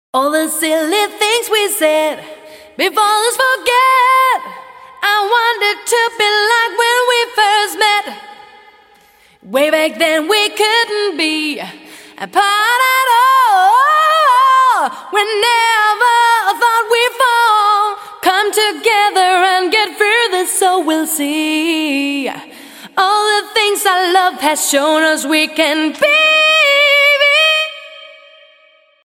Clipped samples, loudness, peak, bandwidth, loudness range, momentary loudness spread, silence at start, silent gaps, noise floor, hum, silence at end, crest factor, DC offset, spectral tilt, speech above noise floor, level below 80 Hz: under 0.1%; -12 LUFS; 0 dBFS; 16.5 kHz; 4 LU; 7 LU; 0.15 s; none; -50 dBFS; none; 1 s; 12 dB; under 0.1%; 0 dB/octave; 37 dB; -66 dBFS